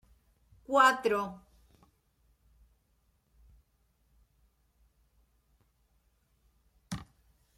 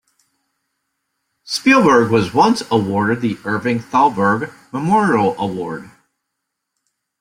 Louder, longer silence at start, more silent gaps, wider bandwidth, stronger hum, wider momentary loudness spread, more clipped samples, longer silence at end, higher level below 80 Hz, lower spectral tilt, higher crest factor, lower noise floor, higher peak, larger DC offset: second, -27 LUFS vs -16 LUFS; second, 0.7 s vs 1.45 s; neither; about the same, 15.5 kHz vs 16 kHz; neither; first, 20 LU vs 12 LU; neither; second, 0.55 s vs 1.35 s; second, -66 dBFS vs -56 dBFS; second, -3.5 dB/octave vs -5.5 dB/octave; first, 26 dB vs 16 dB; second, -73 dBFS vs -77 dBFS; second, -12 dBFS vs -2 dBFS; neither